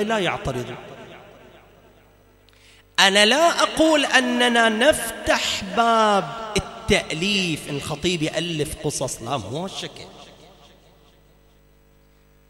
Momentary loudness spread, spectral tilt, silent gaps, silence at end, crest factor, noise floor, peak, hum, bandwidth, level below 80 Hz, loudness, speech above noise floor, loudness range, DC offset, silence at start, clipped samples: 15 LU; -3 dB/octave; none; 2.2 s; 22 dB; -55 dBFS; 0 dBFS; none; 16 kHz; -46 dBFS; -20 LUFS; 34 dB; 12 LU; under 0.1%; 0 s; under 0.1%